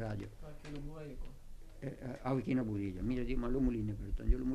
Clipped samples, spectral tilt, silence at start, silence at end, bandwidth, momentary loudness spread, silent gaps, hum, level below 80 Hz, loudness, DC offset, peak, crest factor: under 0.1%; -8.5 dB/octave; 0 s; 0 s; 12.5 kHz; 17 LU; none; none; -42 dBFS; -39 LUFS; under 0.1%; -18 dBFS; 20 dB